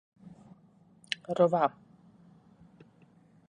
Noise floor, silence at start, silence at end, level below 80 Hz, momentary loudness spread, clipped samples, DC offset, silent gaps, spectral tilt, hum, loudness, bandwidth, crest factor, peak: -61 dBFS; 0.25 s; 1.8 s; -76 dBFS; 14 LU; under 0.1%; under 0.1%; none; -6 dB/octave; none; -29 LUFS; 10.5 kHz; 24 dB; -12 dBFS